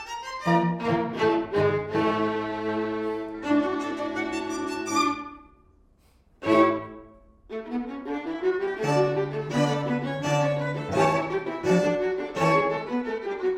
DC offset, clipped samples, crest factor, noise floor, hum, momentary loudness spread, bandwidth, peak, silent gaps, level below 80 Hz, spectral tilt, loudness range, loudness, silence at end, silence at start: under 0.1%; under 0.1%; 18 dB; -60 dBFS; none; 9 LU; 15 kHz; -8 dBFS; none; -58 dBFS; -6 dB/octave; 4 LU; -26 LUFS; 0 s; 0 s